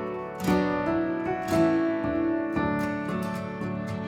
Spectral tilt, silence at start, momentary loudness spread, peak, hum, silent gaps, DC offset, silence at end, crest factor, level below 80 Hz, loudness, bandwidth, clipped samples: -7 dB/octave; 0 s; 8 LU; -12 dBFS; none; none; under 0.1%; 0 s; 16 dB; -50 dBFS; -27 LUFS; 16 kHz; under 0.1%